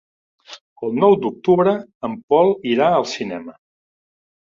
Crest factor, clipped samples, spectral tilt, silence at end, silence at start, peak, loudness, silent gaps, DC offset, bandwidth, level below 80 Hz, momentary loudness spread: 18 dB; under 0.1%; -6.5 dB/octave; 0.9 s; 0.5 s; -2 dBFS; -18 LUFS; 0.61-0.76 s, 1.95-2.01 s, 2.23-2.28 s; under 0.1%; 7.4 kHz; -62 dBFS; 13 LU